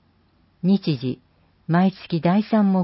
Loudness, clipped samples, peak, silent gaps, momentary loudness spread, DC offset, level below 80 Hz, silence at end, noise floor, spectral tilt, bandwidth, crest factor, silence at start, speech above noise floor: -21 LUFS; under 0.1%; -8 dBFS; none; 11 LU; under 0.1%; -62 dBFS; 0 s; -60 dBFS; -12 dB/octave; 5.8 kHz; 14 dB; 0.65 s; 41 dB